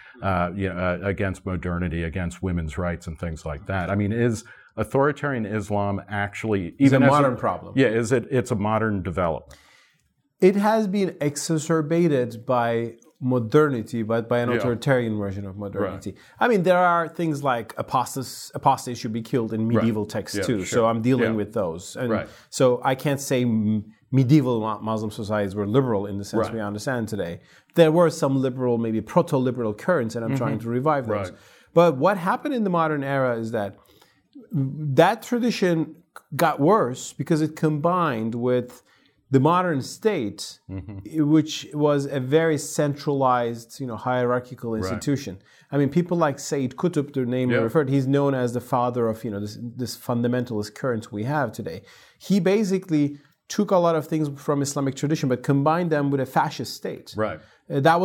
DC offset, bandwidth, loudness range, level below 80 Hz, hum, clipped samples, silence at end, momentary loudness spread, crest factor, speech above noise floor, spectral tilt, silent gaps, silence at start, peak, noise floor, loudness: under 0.1%; 17.5 kHz; 3 LU; -54 dBFS; none; under 0.1%; 0 s; 11 LU; 20 dB; 45 dB; -6.5 dB/octave; none; 0.15 s; -4 dBFS; -68 dBFS; -23 LUFS